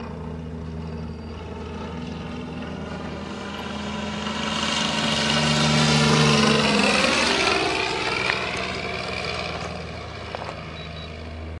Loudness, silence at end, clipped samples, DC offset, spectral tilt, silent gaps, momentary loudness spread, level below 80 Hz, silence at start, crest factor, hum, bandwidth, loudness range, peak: -22 LUFS; 0 s; under 0.1%; under 0.1%; -4 dB/octave; none; 17 LU; -46 dBFS; 0 s; 24 dB; none; 11.5 kHz; 14 LU; 0 dBFS